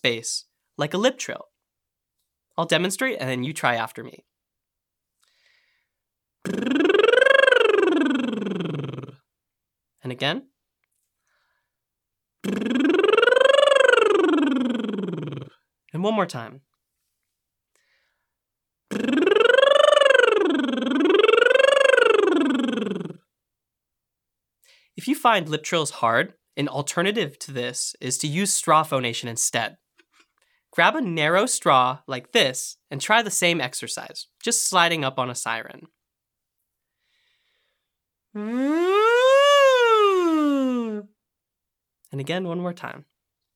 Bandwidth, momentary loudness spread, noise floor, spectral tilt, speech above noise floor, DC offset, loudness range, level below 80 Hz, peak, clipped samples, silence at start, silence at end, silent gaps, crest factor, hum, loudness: 18.5 kHz; 17 LU; -84 dBFS; -3.5 dB/octave; 61 dB; under 0.1%; 12 LU; -78 dBFS; -2 dBFS; under 0.1%; 0.05 s; 0.55 s; none; 20 dB; none; -20 LUFS